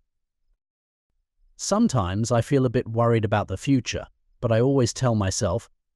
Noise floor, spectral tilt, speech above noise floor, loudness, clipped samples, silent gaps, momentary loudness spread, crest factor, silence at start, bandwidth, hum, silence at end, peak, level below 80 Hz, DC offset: -72 dBFS; -6 dB/octave; 50 dB; -23 LUFS; under 0.1%; none; 10 LU; 14 dB; 1.6 s; 12 kHz; none; 0.3 s; -10 dBFS; -50 dBFS; under 0.1%